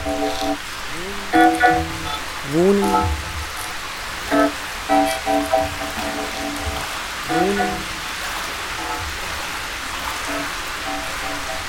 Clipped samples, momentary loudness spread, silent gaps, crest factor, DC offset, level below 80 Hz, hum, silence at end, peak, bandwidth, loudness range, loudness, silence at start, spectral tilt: under 0.1%; 10 LU; none; 20 dB; under 0.1%; -38 dBFS; none; 0 s; -2 dBFS; 17.5 kHz; 6 LU; -21 LUFS; 0 s; -3.5 dB/octave